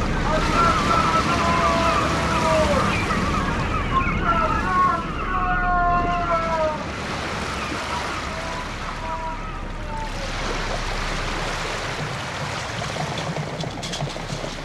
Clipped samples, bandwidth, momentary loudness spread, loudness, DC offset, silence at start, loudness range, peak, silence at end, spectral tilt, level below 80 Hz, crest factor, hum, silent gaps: under 0.1%; 13.5 kHz; 10 LU; -23 LUFS; under 0.1%; 0 s; 8 LU; -6 dBFS; 0 s; -4.5 dB/octave; -32 dBFS; 16 dB; none; none